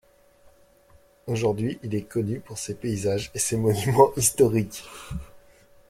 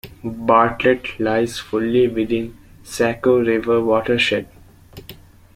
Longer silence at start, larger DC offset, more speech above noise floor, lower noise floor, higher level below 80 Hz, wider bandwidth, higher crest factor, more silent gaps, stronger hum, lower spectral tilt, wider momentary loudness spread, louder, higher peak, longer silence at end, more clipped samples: first, 1.25 s vs 0.05 s; neither; first, 33 dB vs 25 dB; first, -57 dBFS vs -42 dBFS; about the same, -50 dBFS vs -46 dBFS; about the same, 16.5 kHz vs 16 kHz; about the same, 22 dB vs 18 dB; neither; neither; about the same, -5 dB/octave vs -5.5 dB/octave; first, 18 LU vs 13 LU; second, -24 LUFS vs -18 LUFS; about the same, -4 dBFS vs -2 dBFS; about the same, 0.5 s vs 0.4 s; neither